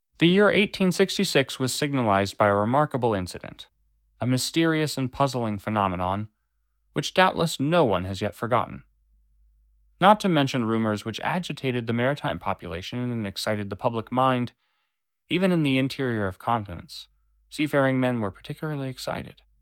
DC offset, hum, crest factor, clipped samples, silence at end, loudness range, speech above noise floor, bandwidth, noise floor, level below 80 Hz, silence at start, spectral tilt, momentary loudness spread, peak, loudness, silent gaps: under 0.1%; none; 22 dB; under 0.1%; 0.3 s; 4 LU; 55 dB; 17 kHz; -79 dBFS; -58 dBFS; 0.2 s; -5.5 dB/octave; 12 LU; -4 dBFS; -24 LUFS; none